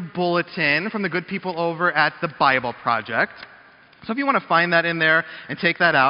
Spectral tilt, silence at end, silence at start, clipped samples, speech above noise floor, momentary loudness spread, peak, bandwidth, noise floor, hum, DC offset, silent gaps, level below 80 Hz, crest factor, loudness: -2.5 dB/octave; 0 s; 0 s; under 0.1%; 29 dB; 8 LU; -4 dBFS; 5.6 kHz; -49 dBFS; none; under 0.1%; none; -62 dBFS; 18 dB; -20 LUFS